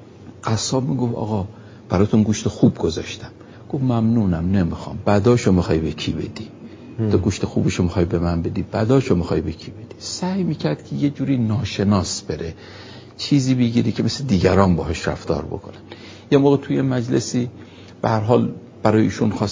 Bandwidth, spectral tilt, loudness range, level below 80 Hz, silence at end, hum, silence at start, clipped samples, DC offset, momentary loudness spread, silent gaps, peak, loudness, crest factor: 7.6 kHz; -6.5 dB/octave; 2 LU; -38 dBFS; 0 s; none; 0 s; under 0.1%; under 0.1%; 16 LU; none; 0 dBFS; -20 LUFS; 20 dB